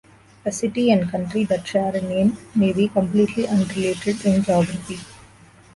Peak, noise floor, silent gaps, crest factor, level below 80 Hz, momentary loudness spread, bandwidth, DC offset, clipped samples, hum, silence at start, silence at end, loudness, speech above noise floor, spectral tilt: -6 dBFS; -49 dBFS; none; 16 dB; -52 dBFS; 7 LU; 11.5 kHz; under 0.1%; under 0.1%; none; 0.45 s; 0.6 s; -21 LUFS; 29 dB; -6.5 dB/octave